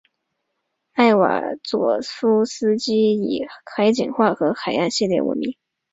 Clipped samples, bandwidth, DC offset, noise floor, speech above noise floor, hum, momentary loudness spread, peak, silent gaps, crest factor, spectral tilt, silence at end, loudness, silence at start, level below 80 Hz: under 0.1%; 8 kHz; under 0.1%; -76 dBFS; 56 dB; none; 8 LU; -2 dBFS; none; 18 dB; -5 dB/octave; 0.4 s; -20 LUFS; 0.95 s; -62 dBFS